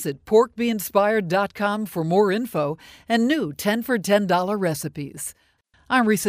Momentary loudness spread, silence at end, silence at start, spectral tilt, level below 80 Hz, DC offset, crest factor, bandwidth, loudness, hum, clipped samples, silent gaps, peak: 11 LU; 0 s; 0 s; -5 dB/octave; -60 dBFS; under 0.1%; 18 dB; 16 kHz; -22 LUFS; none; under 0.1%; none; -4 dBFS